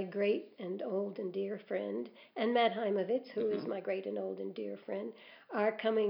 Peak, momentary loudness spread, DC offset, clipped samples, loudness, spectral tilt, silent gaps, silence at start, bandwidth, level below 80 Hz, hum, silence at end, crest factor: -18 dBFS; 11 LU; under 0.1%; under 0.1%; -36 LUFS; -9 dB/octave; none; 0 s; 5.6 kHz; under -90 dBFS; none; 0 s; 18 dB